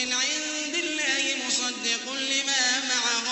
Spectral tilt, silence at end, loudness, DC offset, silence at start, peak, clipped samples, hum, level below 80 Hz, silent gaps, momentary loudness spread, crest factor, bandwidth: 1.5 dB/octave; 0 s; -24 LUFS; under 0.1%; 0 s; -8 dBFS; under 0.1%; none; -74 dBFS; none; 5 LU; 18 dB; 8.4 kHz